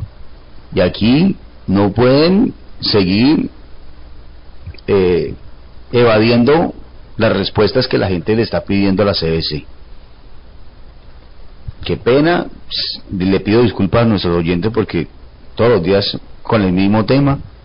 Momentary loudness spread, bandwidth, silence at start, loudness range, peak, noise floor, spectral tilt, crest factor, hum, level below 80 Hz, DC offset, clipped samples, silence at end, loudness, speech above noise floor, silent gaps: 14 LU; 5.4 kHz; 0 s; 6 LU; -4 dBFS; -36 dBFS; -11 dB/octave; 10 dB; none; -34 dBFS; 0.4%; under 0.1%; 0.05 s; -14 LUFS; 23 dB; none